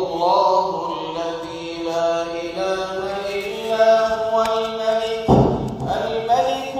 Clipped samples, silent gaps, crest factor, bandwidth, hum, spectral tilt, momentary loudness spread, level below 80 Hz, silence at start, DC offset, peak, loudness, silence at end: under 0.1%; none; 18 dB; 15.5 kHz; none; -6 dB/octave; 10 LU; -42 dBFS; 0 s; under 0.1%; -2 dBFS; -20 LUFS; 0 s